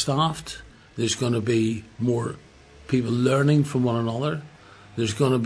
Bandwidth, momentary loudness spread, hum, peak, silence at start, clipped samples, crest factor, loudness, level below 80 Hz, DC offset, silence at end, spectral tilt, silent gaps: 11 kHz; 15 LU; none; -8 dBFS; 0 s; under 0.1%; 16 dB; -24 LUFS; -54 dBFS; under 0.1%; 0 s; -6 dB/octave; none